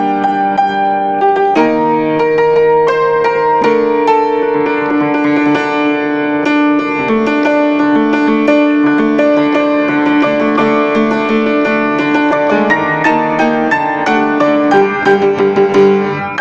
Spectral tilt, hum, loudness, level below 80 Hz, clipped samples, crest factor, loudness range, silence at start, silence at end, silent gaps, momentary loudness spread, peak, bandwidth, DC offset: -6.5 dB/octave; none; -11 LUFS; -48 dBFS; under 0.1%; 10 dB; 1 LU; 0 s; 0 s; none; 3 LU; 0 dBFS; 7.6 kHz; under 0.1%